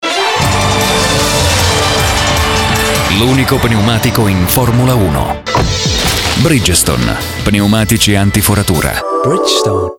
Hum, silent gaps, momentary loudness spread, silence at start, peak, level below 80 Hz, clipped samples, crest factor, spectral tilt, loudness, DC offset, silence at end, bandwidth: none; none; 4 LU; 0 s; 0 dBFS; -24 dBFS; under 0.1%; 10 dB; -4 dB/octave; -10 LUFS; 0.3%; 0.05 s; 19 kHz